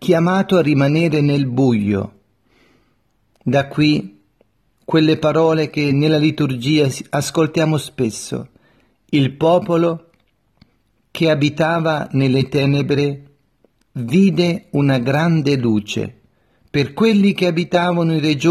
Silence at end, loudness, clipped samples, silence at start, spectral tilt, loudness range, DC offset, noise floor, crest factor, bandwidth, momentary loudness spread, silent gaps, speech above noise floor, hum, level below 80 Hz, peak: 0 s; -17 LUFS; under 0.1%; 0 s; -6.5 dB/octave; 3 LU; under 0.1%; -63 dBFS; 16 dB; 13.5 kHz; 8 LU; none; 47 dB; none; -54 dBFS; -2 dBFS